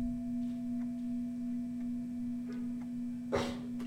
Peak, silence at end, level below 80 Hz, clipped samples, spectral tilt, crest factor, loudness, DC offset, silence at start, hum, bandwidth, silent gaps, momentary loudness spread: -20 dBFS; 0 s; -56 dBFS; under 0.1%; -6.5 dB/octave; 18 dB; -38 LUFS; under 0.1%; 0 s; none; 11 kHz; none; 4 LU